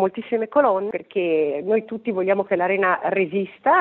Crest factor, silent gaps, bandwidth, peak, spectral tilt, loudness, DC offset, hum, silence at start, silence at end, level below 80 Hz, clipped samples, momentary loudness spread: 16 dB; none; 4.2 kHz; -6 dBFS; -4.5 dB/octave; -21 LUFS; under 0.1%; none; 0 s; 0 s; -70 dBFS; under 0.1%; 6 LU